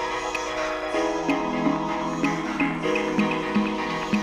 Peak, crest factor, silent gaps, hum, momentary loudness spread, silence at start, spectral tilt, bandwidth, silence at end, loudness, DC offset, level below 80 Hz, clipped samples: -10 dBFS; 16 dB; none; none; 4 LU; 0 s; -5 dB/octave; 14 kHz; 0 s; -25 LUFS; under 0.1%; -50 dBFS; under 0.1%